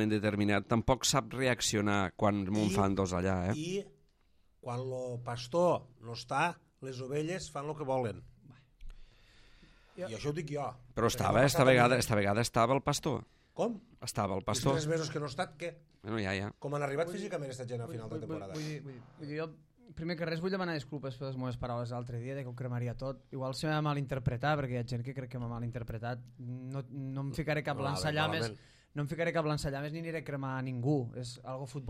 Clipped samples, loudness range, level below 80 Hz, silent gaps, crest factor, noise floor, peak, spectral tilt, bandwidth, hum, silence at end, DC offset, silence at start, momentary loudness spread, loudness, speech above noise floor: under 0.1%; 10 LU; -56 dBFS; none; 22 dB; -68 dBFS; -12 dBFS; -5 dB/octave; 15 kHz; none; 0 s; under 0.1%; 0 s; 13 LU; -34 LUFS; 34 dB